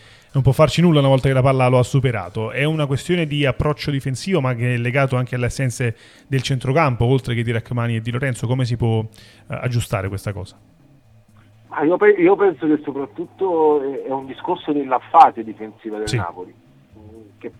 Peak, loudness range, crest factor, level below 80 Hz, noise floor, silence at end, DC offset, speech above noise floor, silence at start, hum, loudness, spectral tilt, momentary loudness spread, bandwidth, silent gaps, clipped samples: 0 dBFS; 6 LU; 18 dB; -44 dBFS; -50 dBFS; 0.1 s; under 0.1%; 32 dB; 0.35 s; none; -19 LUFS; -6.5 dB/octave; 14 LU; 13 kHz; none; under 0.1%